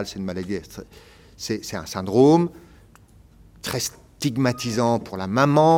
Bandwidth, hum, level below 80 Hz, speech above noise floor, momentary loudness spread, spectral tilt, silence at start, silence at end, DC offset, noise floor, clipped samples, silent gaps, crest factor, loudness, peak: 17 kHz; none; -54 dBFS; 30 dB; 15 LU; -5.5 dB/octave; 0 s; 0 s; under 0.1%; -51 dBFS; under 0.1%; none; 20 dB; -22 LUFS; -4 dBFS